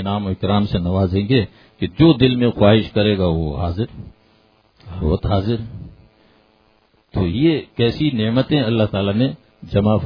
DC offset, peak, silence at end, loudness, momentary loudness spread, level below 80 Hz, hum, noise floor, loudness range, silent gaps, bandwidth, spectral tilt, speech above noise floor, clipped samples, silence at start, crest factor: under 0.1%; 0 dBFS; 0 s; -18 LUFS; 13 LU; -36 dBFS; none; -58 dBFS; 8 LU; none; 5.2 kHz; -10 dB/octave; 40 dB; under 0.1%; 0 s; 18 dB